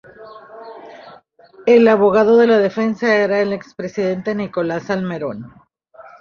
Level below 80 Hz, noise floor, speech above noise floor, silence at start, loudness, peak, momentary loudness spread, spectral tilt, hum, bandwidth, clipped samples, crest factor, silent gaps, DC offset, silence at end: -58 dBFS; -46 dBFS; 31 dB; 0.2 s; -16 LUFS; -2 dBFS; 24 LU; -7 dB/octave; none; 7 kHz; under 0.1%; 16 dB; none; under 0.1%; 0.2 s